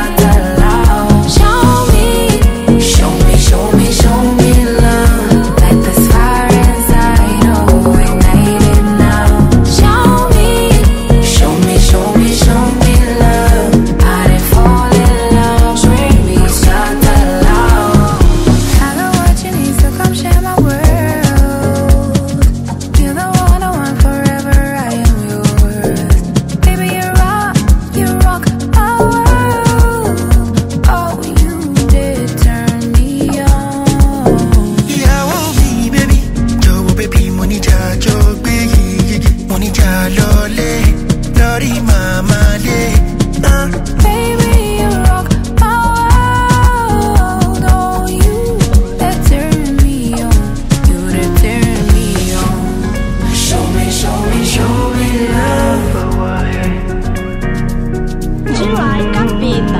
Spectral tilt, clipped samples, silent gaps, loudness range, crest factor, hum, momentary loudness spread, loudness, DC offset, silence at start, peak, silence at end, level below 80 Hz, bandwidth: -5.5 dB/octave; 0.6%; none; 4 LU; 8 dB; none; 5 LU; -11 LUFS; under 0.1%; 0 s; 0 dBFS; 0 s; -12 dBFS; 16.5 kHz